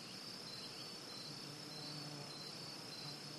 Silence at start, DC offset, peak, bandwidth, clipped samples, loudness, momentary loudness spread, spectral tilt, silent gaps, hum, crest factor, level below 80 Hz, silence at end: 0 s; under 0.1%; -34 dBFS; 13 kHz; under 0.1%; -48 LUFS; 1 LU; -3 dB/octave; none; none; 16 dB; -82 dBFS; 0 s